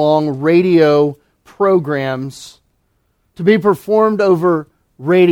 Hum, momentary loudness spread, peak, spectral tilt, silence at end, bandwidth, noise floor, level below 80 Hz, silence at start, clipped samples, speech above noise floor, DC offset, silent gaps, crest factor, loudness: none; 11 LU; 0 dBFS; -7.5 dB/octave; 0 s; 14 kHz; -62 dBFS; -56 dBFS; 0 s; under 0.1%; 50 dB; under 0.1%; none; 14 dB; -14 LUFS